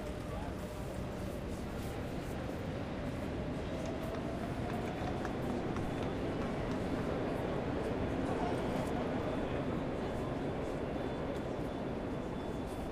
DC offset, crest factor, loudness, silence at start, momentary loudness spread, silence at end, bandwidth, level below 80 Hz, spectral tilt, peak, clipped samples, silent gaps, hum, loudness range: under 0.1%; 16 dB; -38 LUFS; 0 s; 5 LU; 0 s; 15.5 kHz; -48 dBFS; -7 dB/octave; -22 dBFS; under 0.1%; none; none; 4 LU